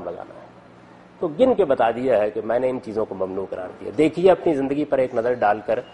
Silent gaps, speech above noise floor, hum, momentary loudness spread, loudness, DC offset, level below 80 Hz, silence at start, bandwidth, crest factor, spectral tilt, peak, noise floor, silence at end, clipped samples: none; 26 dB; none; 12 LU; -21 LUFS; under 0.1%; -56 dBFS; 0 s; 10 kHz; 18 dB; -7 dB/octave; -4 dBFS; -47 dBFS; 0 s; under 0.1%